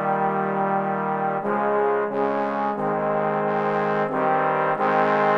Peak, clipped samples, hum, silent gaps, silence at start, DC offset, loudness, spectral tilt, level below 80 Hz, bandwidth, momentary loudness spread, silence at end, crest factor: -6 dBFS; under 0.1%; none; none; 0 s; under 0.1%; -23 LUFS; -8 dB/octave; -70 dBFS; 6.8 kHz; 3 LU; 0 s; 16 dB